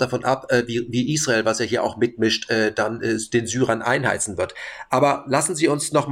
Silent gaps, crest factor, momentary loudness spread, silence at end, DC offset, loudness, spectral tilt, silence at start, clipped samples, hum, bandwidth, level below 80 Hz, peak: none; 16 dB; 5 LU; 0 s; under 0.1%; -21 LUFS; -4 dB/octave; 0 s; under 0.1%; none; 16.5 kHz; -56 dBFS; -6 dBFS